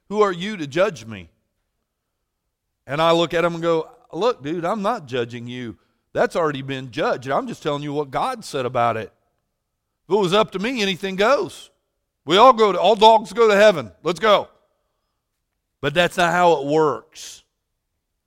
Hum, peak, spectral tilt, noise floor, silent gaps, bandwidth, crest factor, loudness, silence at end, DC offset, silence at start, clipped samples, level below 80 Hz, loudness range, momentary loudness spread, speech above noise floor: none; 0 dBFS; -4.5 dB/octave; -77 dBFS; none; 16 kHz; 20 dB; -19 LUFS; 0.9 s; under 0.1%; 0.1 s; under 0.1%; -56 dBFS; 8 LU; 18 LU; 58 dB